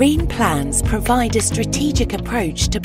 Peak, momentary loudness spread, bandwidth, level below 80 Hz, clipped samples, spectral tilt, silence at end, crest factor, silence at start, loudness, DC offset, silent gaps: -2 dBFS; 4 LU; 16 kHz; -26 dBFS; under 0.1%; -4.5 dB/octave; 0 s; 14 dB; 0 s; -18 LUFS; under 0.1%; none